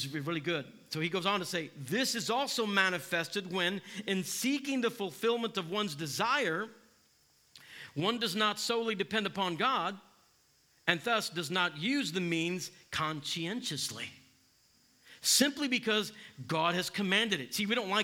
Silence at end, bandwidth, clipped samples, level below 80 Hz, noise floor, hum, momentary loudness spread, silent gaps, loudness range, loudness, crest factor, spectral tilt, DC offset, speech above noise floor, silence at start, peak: 0 s; 18 kHz; under 0.1%; -78 dBFS; -68 dBFS; none; 9 LU; none; 3 LU; -32 LUFS; 26 dB; -3 dB/octave; under 0.1%; 35 dB; 0 s; -8 dBFS